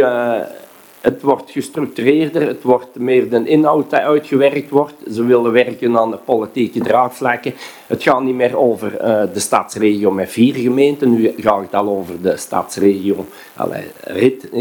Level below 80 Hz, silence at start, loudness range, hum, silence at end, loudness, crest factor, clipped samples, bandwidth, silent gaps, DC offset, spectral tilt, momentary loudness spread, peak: -60 dBFS; 0 s; 2 LU; none; 0 s; -16 LUFS; 16 dB; under 0.1%; 19 kHz; none; under 0.1%; -5.5 dB/octave; 9 LU; 0 dBFS